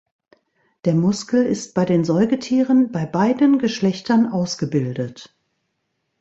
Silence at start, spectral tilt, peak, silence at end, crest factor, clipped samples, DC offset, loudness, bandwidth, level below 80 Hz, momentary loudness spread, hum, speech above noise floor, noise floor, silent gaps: 0.85 s; -6.5 dB/octave; -4 dBFS; 0.95 s; 16 dB; under 0.1%; under 0.1%; -19 LUFS; 8 kHz; -60 dBFS; 6 LU; none; 55 dB; -73 dBFS; none